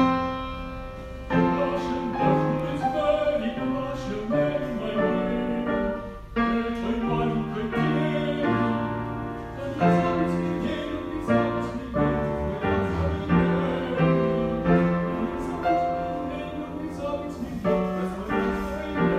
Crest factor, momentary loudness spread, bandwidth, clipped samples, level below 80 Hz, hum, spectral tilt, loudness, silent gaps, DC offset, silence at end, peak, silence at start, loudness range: 18 dB; 9 LU; 9.8 kHz; under 0.1%; -42 dBFS; none; -8 dB/octave; -26 LUFS; none; under 0.1%; 0 s; -8 dBFS; 0 s; 3 LU